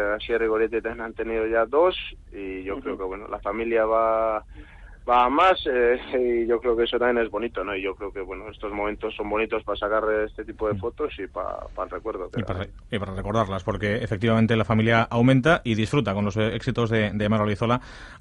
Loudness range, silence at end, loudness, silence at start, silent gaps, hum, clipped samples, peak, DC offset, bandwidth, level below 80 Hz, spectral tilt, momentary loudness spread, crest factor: 7 LU; 0.05 s; -24 LUFS; 0 s; none; none; under 0.1%; -6 dBFS; under 0.1%; 11 kHz; -44 dBFS; -7 dB/octave; 12 LU; 18 dB